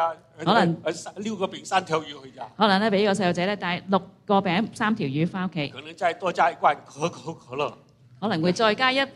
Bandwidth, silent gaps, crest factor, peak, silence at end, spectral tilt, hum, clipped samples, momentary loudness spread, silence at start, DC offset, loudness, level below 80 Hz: 11.5 kHz; none; 20 dB; -4 dBFS; 0.05 s; -5.5 dB/octave; none; under 0.1%; 11 LU; 0 s; under 0.1%; -24 LUFS; -66 dBFS